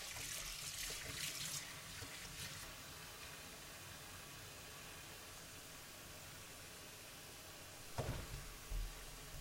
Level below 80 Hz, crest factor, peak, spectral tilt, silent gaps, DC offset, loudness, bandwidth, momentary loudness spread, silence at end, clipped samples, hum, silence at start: -58 dBFS; 22 dB; -28 dBFS; -2 dB/octave; none; under 0.1%; -49 LUFS; 16 kHz; 9 LU; 0 s; under 0.1%; none; 0 s